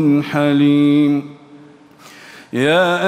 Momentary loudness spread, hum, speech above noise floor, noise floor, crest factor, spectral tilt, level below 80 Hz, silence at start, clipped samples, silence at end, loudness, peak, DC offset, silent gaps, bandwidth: 11 LU; none; 29 dB; -43 dBFS; 12 dB; -6.5 dB/octave; -62 dBFS; 0 s; under 0.1%; 0 s; -15 LUFS; -2 dBFS; under 0.1%; none; 10.5 kHz